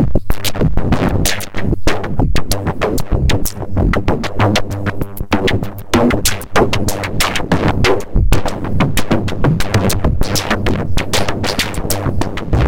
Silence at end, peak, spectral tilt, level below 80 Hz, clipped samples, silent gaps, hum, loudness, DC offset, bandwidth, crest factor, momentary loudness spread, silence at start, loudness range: 0 s; 0 dBFS; -5 dB/octave; -22 dBFS; under 0.1%; none; none; -17 LUFS; under 0.1%; 17 kHz; 12 dB; 5 LU; 0 s; 2 LU